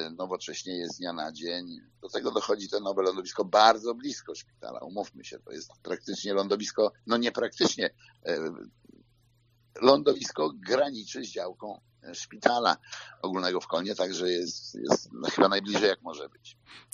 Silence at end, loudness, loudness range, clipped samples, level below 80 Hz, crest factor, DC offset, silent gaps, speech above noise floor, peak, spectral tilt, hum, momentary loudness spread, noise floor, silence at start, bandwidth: 0.15 s; -29 LUFS; 4 LU; under 0.1%; -74 dBFS; 26 dB; under 0.1%; none; 36 dB; -2 dBFS; -2 dB/octave; none; 19 LU; -66 dBFS; 0 s; 7.6 kHz